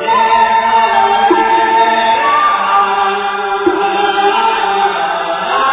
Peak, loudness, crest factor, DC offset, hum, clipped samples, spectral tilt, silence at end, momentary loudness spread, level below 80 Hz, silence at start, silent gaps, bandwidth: 0 dBFS; -11 LUFS; 12 dB; under 0.1%; none; under 0.1%; -7 dB/octave; 0 s; 5 LU; -50 dBFS; 0 s; none; 4 kHz